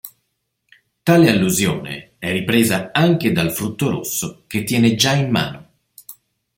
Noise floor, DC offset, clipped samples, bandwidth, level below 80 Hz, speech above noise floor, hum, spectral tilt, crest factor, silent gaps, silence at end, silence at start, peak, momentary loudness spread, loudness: -72 dBFS; under 0.1%; under 0.1%; 16.5 kHz; -52 dBFS; 55 dB; none; -4.5 dB/octave; 18 dB; none; 0.45 s; 0.05 s; -2 dBFS; 11 LU; -17 LUFS